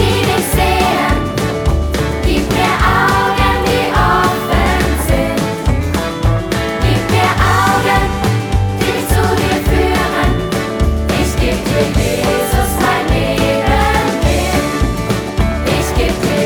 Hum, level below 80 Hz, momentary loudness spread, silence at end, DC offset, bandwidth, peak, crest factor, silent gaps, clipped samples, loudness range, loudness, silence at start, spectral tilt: none; -20 dBFS; 5 LU; 0 s; under 0.1%; over 20 kHz; 0 dBFS; 12 dB; none; under 0.1%; 2 LU; -14 LUFS; 0 s; -5 dB/octave